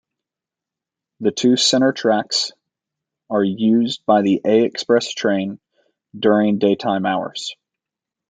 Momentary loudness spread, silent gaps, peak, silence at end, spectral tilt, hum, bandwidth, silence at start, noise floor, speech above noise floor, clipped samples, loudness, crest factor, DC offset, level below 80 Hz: 9 LU; none; -2 dBFS; 0.75 s; -4.5 dB/octave; none; 9.4 kHz; 1.2 s; -87 dBFS; 70 dB; under 0.1%; -18 LUFS; 18 dB; under 0.1%; -68 dBFS